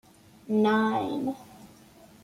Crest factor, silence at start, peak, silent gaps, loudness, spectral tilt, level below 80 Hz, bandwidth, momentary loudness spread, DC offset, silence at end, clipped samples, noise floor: 16 dB; 0.45 s; -14 dBFS; none; -27 LUFS; -6.5 dB/octave; -68 dBFS; 14.5 kHz; 11 LU; under 0.1%; 0.55 s; under 0.1%; -54 dBFS